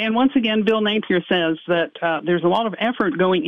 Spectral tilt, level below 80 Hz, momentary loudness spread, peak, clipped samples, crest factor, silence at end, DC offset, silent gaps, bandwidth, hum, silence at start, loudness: -7.5 dB/octave; -64 dBFS; 4 LU; -6 dBFS; under 0.1%; 14 dB; 0 s; 0.1%; none; 6 kHz; none; 0 s; -20 LUFS